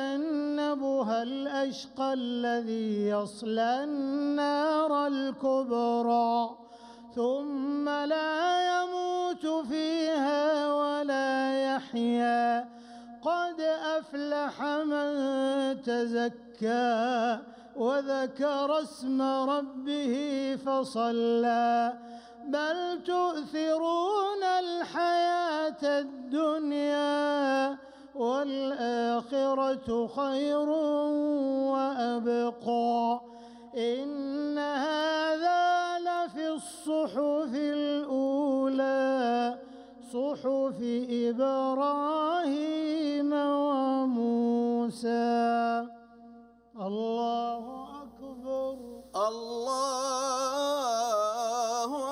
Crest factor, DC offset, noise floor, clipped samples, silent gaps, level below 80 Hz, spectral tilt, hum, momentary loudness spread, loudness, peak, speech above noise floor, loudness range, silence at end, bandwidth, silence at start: 12 dB; under 0.1%; -53 dBFS; under 0.1%; none; -72 dBFS; -4 dB/octave; none; 7 LU; -29 LUFS; -16 dBFS; 25 dB; 2 LU; 0 s; 14.5 kHz; 0 s